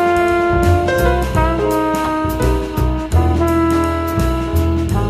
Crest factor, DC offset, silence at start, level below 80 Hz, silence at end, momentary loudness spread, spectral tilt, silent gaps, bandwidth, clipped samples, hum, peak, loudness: 14 dB; under 0.1%; 0 s; -22 dBFS; 0 s; 4 LU; -7 dB/octave; none; 14.5 kHz; under 0.1%; none; -2 dBFS; -16 LUFS